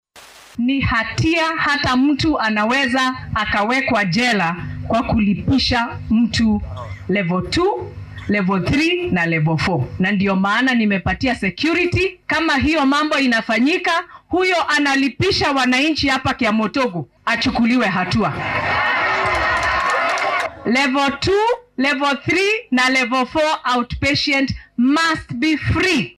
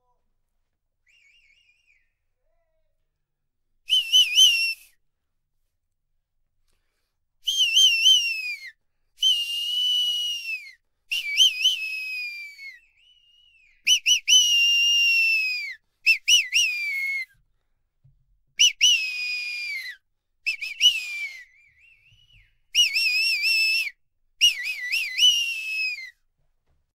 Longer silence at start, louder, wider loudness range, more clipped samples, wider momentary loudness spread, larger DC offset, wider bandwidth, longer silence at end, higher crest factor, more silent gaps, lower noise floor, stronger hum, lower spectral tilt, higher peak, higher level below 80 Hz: second, 0.15 s vs 3.9 s; about the same, -17 LUFS vs -19 LUFS; second, 2 LU vs 6 LU; neither; second, 5 LU vs 16 LU; neither; second, 14 kHz vs 16 kHz; second, 0.05 s vs 0.9 s; second, 10 dB vs 20 dB; neither; second, -43 dBFS vs -77 dBFS; neither; first, -5 dB/octave vs 7 dB/octave; about the same, -8 dBFS vs -6 dBFS; first, -38 dBFS vs -70 dBFS